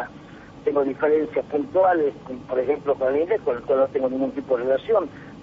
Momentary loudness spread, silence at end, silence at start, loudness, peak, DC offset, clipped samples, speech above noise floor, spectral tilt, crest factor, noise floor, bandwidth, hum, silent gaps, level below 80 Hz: 8 LU; 0 s; 0 s; -23 LUFS; -8 dBFS; under 0.1%; under 0.1%; 21 dB; -5 dB/octave; 14 dB; -43 dBFS; 6.6 kHz; none; none; -56 dBFS